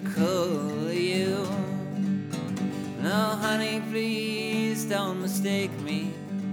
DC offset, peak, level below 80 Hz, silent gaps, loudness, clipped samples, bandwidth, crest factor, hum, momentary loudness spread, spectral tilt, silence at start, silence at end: under 0.1%; -12 dBFS; -72 dBFS; none; -28 LUFS; under 0.1%; 18.5 kHz; 16 dB; none; 5 LU; -5 dB/octave; 0 s; 0 s